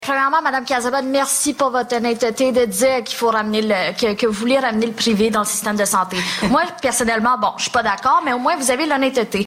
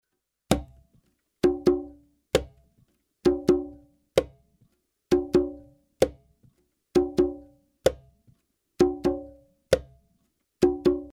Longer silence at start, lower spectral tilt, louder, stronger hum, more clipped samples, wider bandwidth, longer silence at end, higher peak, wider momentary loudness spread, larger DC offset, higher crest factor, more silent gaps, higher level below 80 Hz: second, 0 s vs 0.5 s; second, -3 dB/octave vs -6 dB/octave; first, -17 LUFS vs -26 LUFS; neither; neither; about the same, 16 kHz vs 15.5 kHz; about the same, 0 s vs 0.05 s; second, -6 dBFS vs -2 dBFS; second, 3 LU vs 18 LU; neither; second, 12 dB vs 26 dB; neither; about the same, -52 dBFS vs -48 dBFS